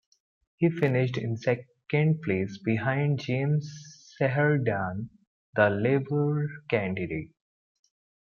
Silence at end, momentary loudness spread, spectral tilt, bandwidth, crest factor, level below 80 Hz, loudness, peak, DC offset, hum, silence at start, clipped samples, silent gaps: 0.95 s; 10 LU; -8 dB/octave; 7 kHz; 18 dB; -64 dBFS; -27 LUFS; -10 dBFS; under 0.1%; none; 0.6 s; under 0.1%; 5.27-5.53 s